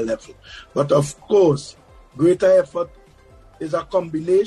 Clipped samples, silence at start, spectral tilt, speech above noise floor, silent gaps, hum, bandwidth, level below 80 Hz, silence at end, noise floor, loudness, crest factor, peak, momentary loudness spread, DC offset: under 0.1%; 0 s; -6.5 dB/octave; 29 dB; none; none; 12 kHz; -52 dBFS; 0 s; -48 dBFS; -19 LUFS; 16 dB; -4 dBFS; 16 LU; under 0.1%